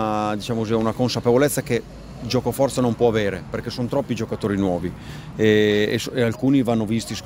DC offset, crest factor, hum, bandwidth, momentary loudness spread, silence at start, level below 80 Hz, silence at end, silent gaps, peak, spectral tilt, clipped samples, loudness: under 0.1%; 18 dB; none; 16 kHz; 9 LU; 0 s; -46 dBFS; 0 s; none; -4 dBFS; -5.5 dB/octave; under 0.1%; -21 LUFS